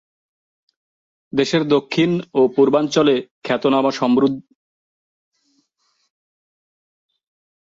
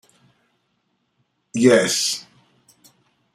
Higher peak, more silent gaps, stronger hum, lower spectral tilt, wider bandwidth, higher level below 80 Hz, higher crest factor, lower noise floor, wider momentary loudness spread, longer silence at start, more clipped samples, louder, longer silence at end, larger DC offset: about the same, -4 dBFS vs -2 dBFS; first, 3.31-3.42 s vs none; neither; first, -6 dB/octave vs -3 dB/octave; second, 7.8 kHz vs 14.5 kHz; about the same, -64 dBFS vs -66 dBFS; about the same, 18 dB vs 22 dB; about the same, -67 dBFS vs -70 dBFS; second, 7 LU vs 15 LU; second, 1.35 s vs 1.55 s; neither; about the same, -18 LUFS vs -18 LUFS; first, 3.35 s vs 1.15 s; neither